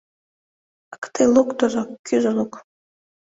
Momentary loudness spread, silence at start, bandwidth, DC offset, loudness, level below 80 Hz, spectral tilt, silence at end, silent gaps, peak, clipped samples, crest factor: 14 LU; 0.9 s; 8 kHz; under 0.1%; -20 LUFS; -60 dBFS; -5 dB/octave; 0.65 s; 0.98-1.02 s, 1.99-2.04 s; -4 dBFS; under 0.1%; 18 dB